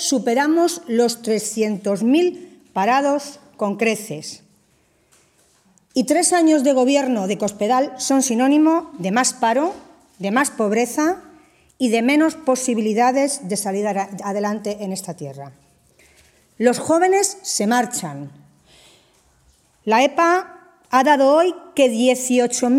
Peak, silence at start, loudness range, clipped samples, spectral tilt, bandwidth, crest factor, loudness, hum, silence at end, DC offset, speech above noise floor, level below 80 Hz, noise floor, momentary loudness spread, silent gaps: -2 dBFS; 0 s; 6 LU; under 0.1%; -3.5 dB/octave; 16 kHz; 18 dB; -18 LUFS; none; 0 s; under 0.1%; 42 dB; -66 dBFS; -60 dBFS; 13 LU; none